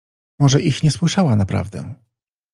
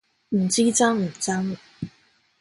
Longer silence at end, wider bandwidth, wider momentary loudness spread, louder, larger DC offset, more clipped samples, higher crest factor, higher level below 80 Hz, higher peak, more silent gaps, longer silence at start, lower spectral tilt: about the same, 0.6 s vs 0.55 s; about the same, 11 kHz vs 11.5 kHz; second, 15 LU vs 19 LU; first, -17 LUFS vs -22 LUFS; neither; neither; about the same, 16 dB vs 18 dB; first, -48 dBFS vs -62 dBFS; first, -2 dBFS vs -6 dBFS; neither; about the same, 0.4 s vs 0.3 s; first, -6 dB/octave vs -4 dB/octave